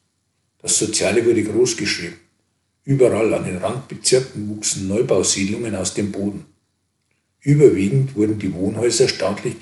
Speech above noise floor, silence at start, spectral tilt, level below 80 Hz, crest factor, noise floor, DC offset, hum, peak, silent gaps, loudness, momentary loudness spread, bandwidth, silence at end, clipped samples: 51 dB; 0.65 s; -4.5 dB/octave; -58 dBFS; 20 dB; -69 dBFS; under 0.1%; none; 0 dBFS; none; -19 LUFS; 11 LU; 12 kHz; 0.05 s; under 0.1%